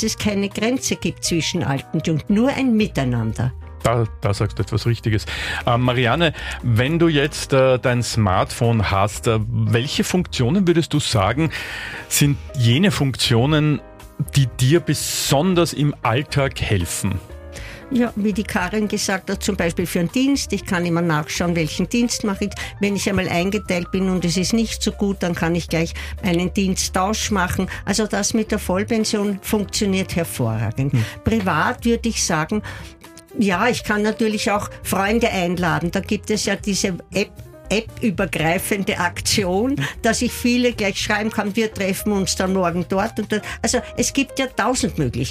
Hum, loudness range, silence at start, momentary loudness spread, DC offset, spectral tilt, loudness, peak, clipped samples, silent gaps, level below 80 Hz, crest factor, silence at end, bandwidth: none; 3 LU; 0 s; 6 LU; under 0.1%; -5 dB/octave; -20 LUFS; -4 dBFS; under 0.1%; none; -38 dBFS; 16 dB; 0 s; 15.5 kHz